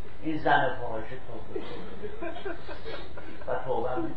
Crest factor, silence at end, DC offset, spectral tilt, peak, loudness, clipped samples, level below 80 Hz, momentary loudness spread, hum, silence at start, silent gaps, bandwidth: 22 dB; 0 s; 5%; -7.5 dB/octave; -10 dBFS; -33 LUFS; under 0.1%; -50 dBFS; 16 LU; none; 0 s; none; 8.4 kHz